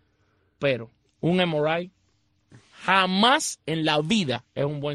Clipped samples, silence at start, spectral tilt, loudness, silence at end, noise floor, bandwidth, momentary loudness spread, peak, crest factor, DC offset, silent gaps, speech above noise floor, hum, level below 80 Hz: under 0.1%; 0.6 s; -4 dB/octave; -24 LUFS; 0 s; -68 dBFS; 12 kHz; 10 LU; -4 dBFS; 20 dB; under 0.1%; none; 44 dB; none; -62 dBFS